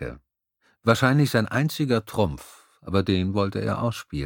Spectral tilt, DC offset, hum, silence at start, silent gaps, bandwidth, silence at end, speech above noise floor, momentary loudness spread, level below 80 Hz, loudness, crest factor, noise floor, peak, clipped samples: -6.5 dB/octave; under 0.1%; none; 0 s; none; 18.5 kHz; 0 s; 44 dB; 8 LU; -48 dBFS; -24 LUFS; 22 dB; -68 dBFS; -2 dBFS; under 0.1%